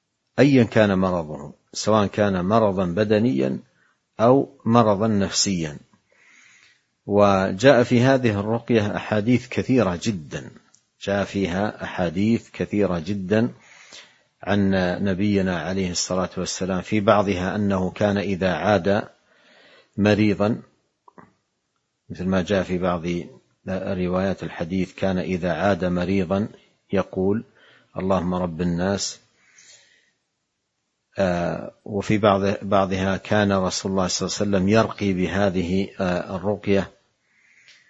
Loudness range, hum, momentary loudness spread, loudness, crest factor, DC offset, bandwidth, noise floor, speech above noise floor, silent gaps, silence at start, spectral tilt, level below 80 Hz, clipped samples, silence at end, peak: 6 LU; none; 11 LU; -22 LUFS; 22 dB; under 0.1%; 8.2 kHz; -76 dBFS; 55 dB; none; 0.4 s; -5.5 dB/octave; -52 dBFS; under 0.1%; 1 s; 0 dBFS